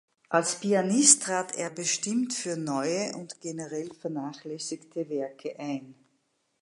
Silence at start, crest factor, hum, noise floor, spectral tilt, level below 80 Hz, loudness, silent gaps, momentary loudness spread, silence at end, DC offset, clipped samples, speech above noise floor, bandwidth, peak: 0.3 s; 26 dB; none; -74 dBFS; -2.5 dB/octave; -82 dBFS; -27 LUFS; none; 17 LU; 0.7 s; under 0.1%; under 0.1%; 45 dB; 11.5 kHz; -4 dBFS